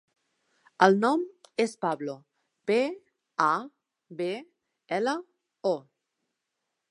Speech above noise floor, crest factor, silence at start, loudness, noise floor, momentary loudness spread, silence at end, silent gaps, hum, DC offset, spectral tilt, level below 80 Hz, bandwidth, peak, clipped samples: 57 dB; 26 dB; 0.8 s; -28 LUFS; -83 dBFS; 16 LU; 1.1 s; none; none; under 0.1%; -5.5 dB/octave; -86 dBFS; 11.5 kHz; -4 dBFS; under 0.1%